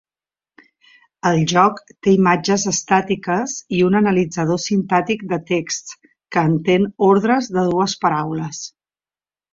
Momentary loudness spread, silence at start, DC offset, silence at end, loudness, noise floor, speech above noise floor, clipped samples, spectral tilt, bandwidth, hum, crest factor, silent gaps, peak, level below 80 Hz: 9 LU; 1.25 s; under 0.1%; 0.85 s; -18 LUFS; under -90 dBFS; over 73 dB; under 0.1%; -5 dB/octave; 7.6 kHz; none; 16 dB; none; -2 dBFS; -56 dBFS